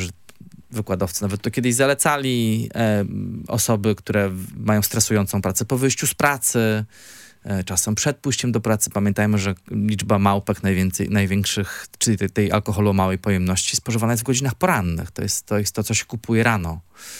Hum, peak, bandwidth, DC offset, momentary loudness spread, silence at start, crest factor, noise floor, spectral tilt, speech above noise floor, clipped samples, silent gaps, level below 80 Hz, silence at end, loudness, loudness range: none; -2 dBFS; 17 kHz; under 0.1%; 8 LU; 0 s; 20 dB; -46 dBFS; -4.5 dB/octave; 25 dB; under 0.1%; none; -50 dBFS; 0 s; -21 LUFS; 1 LU